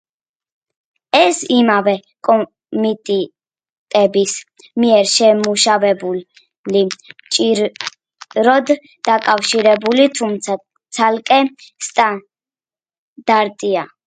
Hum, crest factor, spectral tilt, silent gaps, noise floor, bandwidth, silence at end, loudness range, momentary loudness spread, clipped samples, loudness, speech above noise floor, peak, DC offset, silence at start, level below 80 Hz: none; 16 dB; -3 dB/octave; 3.72-3.86 s, 6.58-6.64 s, 12.98-13.16 s; under -90 dBFS; 9.6 kHz; 0.2 s; 3 LU; 12 LU; under 0.1%; -15 LUFS; over 75 dB; 0 dBFS; under 0.1%; 1.15 s; -66 dBFS